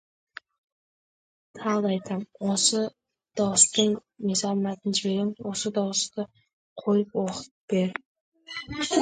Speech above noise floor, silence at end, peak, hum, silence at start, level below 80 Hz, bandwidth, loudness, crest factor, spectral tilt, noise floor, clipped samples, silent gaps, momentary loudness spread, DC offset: over 64 dB; 0 s; -2 dBFS; none; 1.55 s; -64 dBFS; 9.6 kHz; -26 LUFS; 26 dB; -3.5 dB/octave; under -90 dBFS; under 0.1%; 6.53-6.76 s, 7.51-7.68 s, 8.05-8.15 s, 8.21-8.32 s; 17 LU; under 0.1%